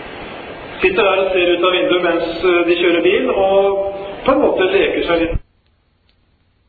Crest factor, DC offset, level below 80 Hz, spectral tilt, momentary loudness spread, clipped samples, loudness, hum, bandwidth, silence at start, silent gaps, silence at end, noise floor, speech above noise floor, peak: 16 dB; under 0.1%; -38 dBFS; -8 dB/octave; 13 LU; under 0.1%; -15 LUFS; none; 4.7 kHz; 0 s; none; 1.3 s; -58 dBFS; 44 dB; 0 dBFS